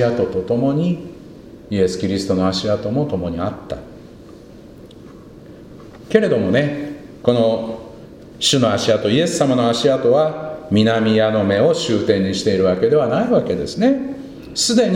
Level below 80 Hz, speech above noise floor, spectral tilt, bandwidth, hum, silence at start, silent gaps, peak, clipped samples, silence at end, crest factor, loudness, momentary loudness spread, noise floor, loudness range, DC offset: -48 dBFS; 23 dB; -5 dB/octave; 16 kHz; none; 0 s; none; 0 dBFS; under 0.1%; 0 s; 18 dB; -17 LUFS; 13 LU; -39 dBFS; 7 LU; under 0.1%